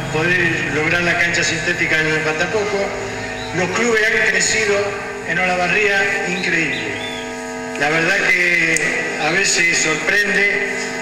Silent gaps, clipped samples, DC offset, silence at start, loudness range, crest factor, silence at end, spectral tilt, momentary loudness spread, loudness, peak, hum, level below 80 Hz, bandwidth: none; under 0.1%; under 0.1%; 0 s; 3 LU; 18 dB; 0 s; -3 dB/octave; 10 LU; -16 LUFS; 0 dBFS; none; -46 dBFS; 17 kHz